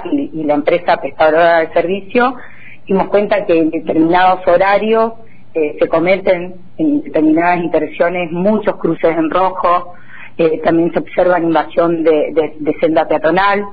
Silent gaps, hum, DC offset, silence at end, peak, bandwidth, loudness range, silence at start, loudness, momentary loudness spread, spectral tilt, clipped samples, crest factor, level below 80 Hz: none; none; 4%; 0 s; -2 dBFS; 5 kHz; 2 LU; 0 s; -14 LUFS; 7 LU; -9.5 dB/octave; under 0.1%; 12 dB; -46 dBFS